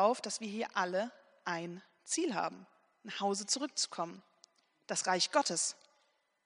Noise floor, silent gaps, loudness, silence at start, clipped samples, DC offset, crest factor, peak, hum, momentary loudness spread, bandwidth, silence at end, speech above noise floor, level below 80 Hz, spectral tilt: -75 dBFS; none; -35 LUFS; 0 s; under 0.1%; under 0.1%; 22 dB; -16 dBFS; none; 16 LU; 10.5 kHz; 0.75 s; 40 dB; -90 dBFS; -2 dB/octave